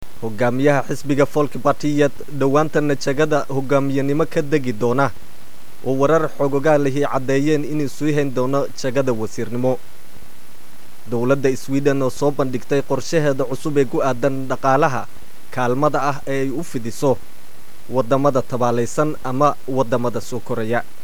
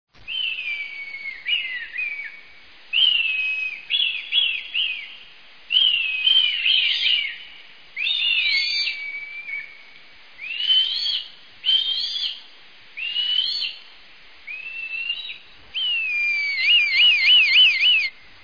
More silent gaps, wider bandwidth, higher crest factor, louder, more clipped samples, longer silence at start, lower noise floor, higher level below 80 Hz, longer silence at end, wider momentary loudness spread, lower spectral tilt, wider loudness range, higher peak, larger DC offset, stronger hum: neither; first, over 20 kHz vs 5.4 kHz; about the same, 18 dB vs 16 dB; about the same, -20 LUFS vs -18 LUFS; neither; about the same, 0.2 s vs 0.25 s; about the same, -46 dBFS vs -48 dBFS; first, -54 dBFS vs -66 dBFS; second, 0.2 s vs 0.35 s; second, 7 LU vs 18 LU; first, -6.5 dB/octave vs 2 dB/octave; second, 3 LU vs 8 LU; first, -2 dBFS vs -6 dBFS; first, 8% vs 0.4%; neither